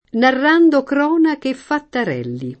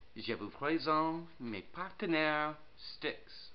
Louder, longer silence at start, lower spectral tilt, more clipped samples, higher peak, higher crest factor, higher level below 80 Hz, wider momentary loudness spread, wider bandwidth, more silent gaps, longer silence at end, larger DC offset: first, -16 LUFS vs -37 LUFS; about the same, 0.15 s vs 0.15 s; first, -6.5 dB/octave vs -2.5 dB/octave; neither; first, -2 dBFS vs -18 dBFS; second, 14 dB vs 20 dB; first, -60 dBFS vs -68 dBFS; about the same, 11 LU vs 13 LU; first, 8.6 kHz vs 5.8 kHz; neither; about the same, 0.05 s vs 0 s; second, under 0.1% vs 0.2%